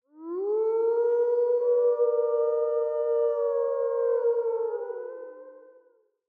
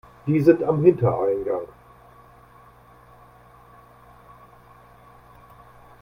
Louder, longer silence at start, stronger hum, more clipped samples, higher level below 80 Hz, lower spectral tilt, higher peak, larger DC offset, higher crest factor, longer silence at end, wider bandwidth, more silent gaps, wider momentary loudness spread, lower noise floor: second, -26 LUFS vs -20 LUFS; about the same, 0.15 s vs 0.25 s; neither; neither; second, under -90 dBFS vs -56 dBFS; second, -6.5 dB/octave vs -10.5 dB/octave; second, -16 dBFS vs -2 dBFS; neither; second, 12 dB vs 24 dB; second, 0.75 s vs 4.35 s; second, 2.3 kHz vs 6 kHz; neither; about the same, 12 LU vs 11 LU; first, -64 dBFS vs -51 dBFS